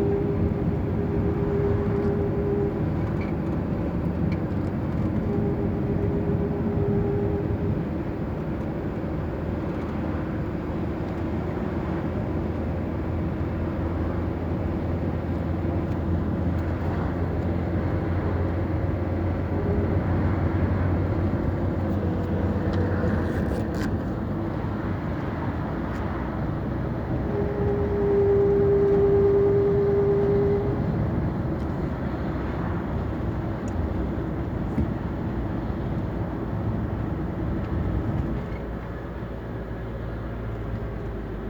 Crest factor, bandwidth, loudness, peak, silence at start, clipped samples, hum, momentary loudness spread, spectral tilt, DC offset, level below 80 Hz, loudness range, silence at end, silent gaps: 14 dB; 7.4 kHz; -26 LUFS; -10 dBFS; 0 s; under 0.1%; none; 8 LU; -10 dB/octave; under 0.1%; -34 dBFS; 7 LU; 0 s; none